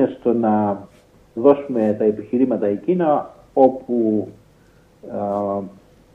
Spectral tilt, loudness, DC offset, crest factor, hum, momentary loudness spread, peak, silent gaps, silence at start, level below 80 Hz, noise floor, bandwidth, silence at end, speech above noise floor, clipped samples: -10 dB/octave; -19 LUFS; under 0.1%; 18 dB; none; 12 LU; 0 dBFS; none; 0 s; -60 dBFS; -52 dBFS; 4.7 kHz; 0.45 s; 34 dB; under 0.1%